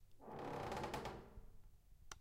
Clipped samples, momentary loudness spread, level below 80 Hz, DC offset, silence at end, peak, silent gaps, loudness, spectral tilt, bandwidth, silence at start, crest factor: under 0.1%; 17 LU; -62 dBFS; under 0.1%; 0 s; -32 dBFS; none; -49 LUFS; -5 dB/octave; 16 kHz; 0 s; 20 dB